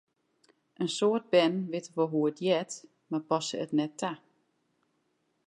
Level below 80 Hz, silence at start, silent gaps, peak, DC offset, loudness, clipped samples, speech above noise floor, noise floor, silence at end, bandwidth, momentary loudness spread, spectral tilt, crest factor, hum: -84 dBFS; 0.8 s; none; -12 dBFS; under 0.1%; -30 LUFS; under 0.1%; 46 dB; -76 dBFS; 1.3 s; 11 kHz; 11 LU; -5 dB/octave; 20 dB; none